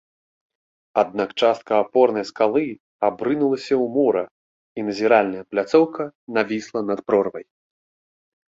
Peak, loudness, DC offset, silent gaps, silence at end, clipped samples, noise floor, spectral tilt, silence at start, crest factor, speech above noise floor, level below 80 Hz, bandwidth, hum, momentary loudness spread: -2 dBFS; -21 LUFS; under 0.1%; 2.80-3.00 s, 4.31-4.75 s, 6.15-6.27 s; 1.05 s; under 0.1%; under -90 dBFS; -6 dB/octave; 0.95 s; 18 dB; over 70 dB; -66 dBFS; 7.8 kHz; none; 10 LU